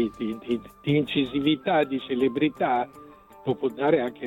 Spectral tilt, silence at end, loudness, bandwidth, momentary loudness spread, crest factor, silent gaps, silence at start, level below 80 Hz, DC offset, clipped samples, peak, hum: -7.5 dB/octave; 0 s; -26 LUFS; 12.5 kHz; 8 LU; 16 dB; none; 0 s; -60 dBFS; under 0.1%; under 0.1%; -8 dBFS; none